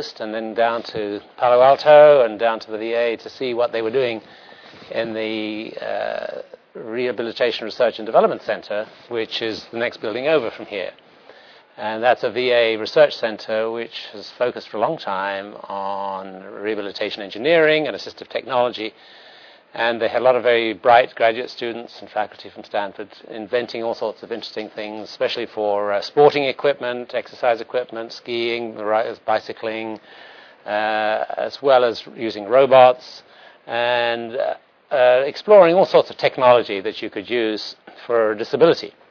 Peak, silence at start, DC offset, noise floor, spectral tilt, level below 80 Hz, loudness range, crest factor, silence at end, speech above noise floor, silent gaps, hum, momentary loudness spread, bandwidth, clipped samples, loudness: 0 dBFS; 0 s; under 0.1%; -47 dBFS; -5.5 dB/octave; -72 dBFS; 9 LU; 20 dB; 0.2 s; 27 dB; none; none; 15 LU; 5.4 kHz; under 0.1%; -19 LUFS